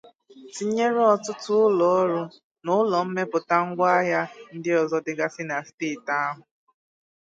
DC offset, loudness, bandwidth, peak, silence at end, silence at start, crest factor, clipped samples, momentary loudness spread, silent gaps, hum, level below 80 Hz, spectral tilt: under 0.1%; -24 LUFS; 9.2 kHz; -6 dBFS; 0.85 s; 0.35 s; 18 dB; under 0.1%; 11 LU; 2.44-2.55 s, 5.74-5.78 s; none; -76 dBFS; -5.5 dB/octave